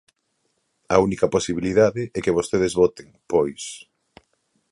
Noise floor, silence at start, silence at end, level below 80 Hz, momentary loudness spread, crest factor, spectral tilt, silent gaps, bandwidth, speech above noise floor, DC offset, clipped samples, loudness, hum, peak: -72 dBFS; 0.9 s; 0.9 s; -50 dBFS; 8 LU; 22 dB; -5.5 dB/octave; none; 11.5 kHz; 51 dB; under 0.1%; under 0.1%; -21 LUFS; none; -2 dBFS